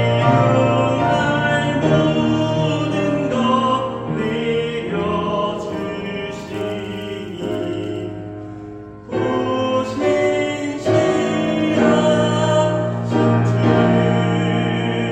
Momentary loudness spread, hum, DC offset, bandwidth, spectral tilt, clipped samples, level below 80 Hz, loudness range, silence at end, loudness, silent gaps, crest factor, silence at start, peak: 12 LU; none; under 0.1%; 8.8 kHz; -6.5 dB/octave; under 0.1%; -48 dBFS; 8 LU; 0 s; -18 LUFS; none; 16 dB; 0 s; -2 dBFS